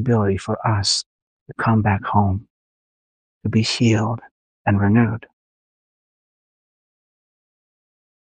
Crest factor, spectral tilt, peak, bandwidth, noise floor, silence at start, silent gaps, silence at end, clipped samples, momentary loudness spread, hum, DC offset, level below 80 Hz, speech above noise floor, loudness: 20 dB; -5.5 dB/octave; -2 dBFS; 9.6 kHz; under -90 dBFS; 0 s; 1.06-1.46 s, 2.50-3.41 s, 4.31-4.65 s; 3.1 s; under 0.1%; 13 LU; none; under 0.1%; -52 dBFS; over 72 dB; -20 LUFS